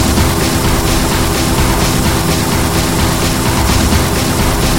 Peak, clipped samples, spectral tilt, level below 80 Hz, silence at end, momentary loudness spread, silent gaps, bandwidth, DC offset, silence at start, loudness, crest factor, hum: 0 dBFS; under 0.1%; -4 dB/octave; -18 dBFS; 0 s; 1 LU; none; 19 kHz; 3%; 0 s; -12 LUFS; 12 dB; none